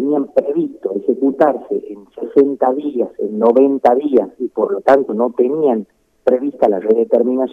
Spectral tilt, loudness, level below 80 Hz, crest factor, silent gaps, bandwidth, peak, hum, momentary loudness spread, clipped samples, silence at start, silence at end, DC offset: -8.5 dB/octave; -16 LUFS; -62 dBFS; 14 dB; none; 5.8 kHz; 0 dBFS; none; 9 LU; under 0.1%; 0 s; 0 s; under 0.1%